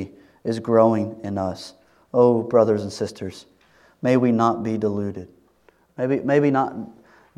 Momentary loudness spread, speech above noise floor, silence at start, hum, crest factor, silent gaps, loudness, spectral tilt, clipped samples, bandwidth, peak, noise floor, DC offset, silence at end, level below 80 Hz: 18 LU; 38 dB; 0 s; none; 20 dB; none; -21 LUFS; -7.5 dB/octave; under 0.1%; 11.5 kHz; -2 dBFS; -59 dBFS; under 0.1%; 0.45 s; -66 dBFS